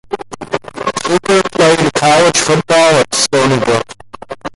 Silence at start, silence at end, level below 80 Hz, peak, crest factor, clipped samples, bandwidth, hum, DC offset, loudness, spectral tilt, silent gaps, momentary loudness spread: 0.1 s; 0.1 s; -46 dBFS; 0 dBFS; 12 dB; under 0.1%; 11.5 kHz; none; under 0.1%; -11 LUFS; -3.5 dB/octave; none; 15 LU